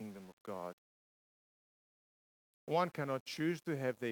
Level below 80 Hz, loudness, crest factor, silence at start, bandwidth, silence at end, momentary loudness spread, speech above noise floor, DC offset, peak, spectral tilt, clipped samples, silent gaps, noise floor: -88 dBFS; -39 LUFS; 22 dB; 0 s; 19 kHz; 0 s; 14 LU; over 52 dB; under 0.1%; -20 dBFS; -6 dB/octave; under 0.1%; 0.33-0.45 s, 0.73-2.67 s, 3.21-3.26 s; under -90 dBFS